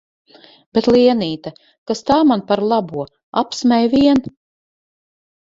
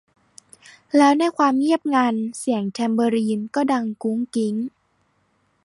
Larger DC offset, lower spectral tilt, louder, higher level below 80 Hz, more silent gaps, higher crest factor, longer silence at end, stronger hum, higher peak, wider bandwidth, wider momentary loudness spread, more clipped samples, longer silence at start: neither; about the same, -5.5 dB/octave vs -5 dB/octave; first, -16 LUFS vs -21 LUFS; first, -50 dBFS vs -72 dBFS; first, 1.78-1.86 s, 3.23-3.33 s vs none; about the same, 16 dB vs 16 dB; first, 1.3 s vs 0.95 s; neither; about the same, -2 dBFS vs -4 dBFS; second, 7.8 kHz vs 11.5 kHz; first, 14 LU vs 8 LU; neither; second, 0.75 s vs 0.95 s